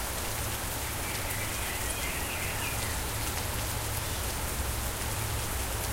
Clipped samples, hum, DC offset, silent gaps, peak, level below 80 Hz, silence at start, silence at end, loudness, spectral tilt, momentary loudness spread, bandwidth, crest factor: under 0.1%; none; under 0.1%; none; -16 dBFS; -38 dBFS; 0 s; 0 s; -32 LUFS; -3 dB/octave; 1 LU; 16 kHz; 16 dB